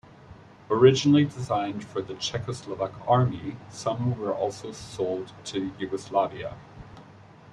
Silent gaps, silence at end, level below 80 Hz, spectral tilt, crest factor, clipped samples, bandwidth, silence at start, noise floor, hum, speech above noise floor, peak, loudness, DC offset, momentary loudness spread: none; 0 s; -58 dBFS; -6 dB/octave; 22 dB; under 0.1%; 11 kHz; 0.3 s; -50 dBFS; none; 24 dB; -6 dBFS; -26 LUFS; under 0.1%; 18 LU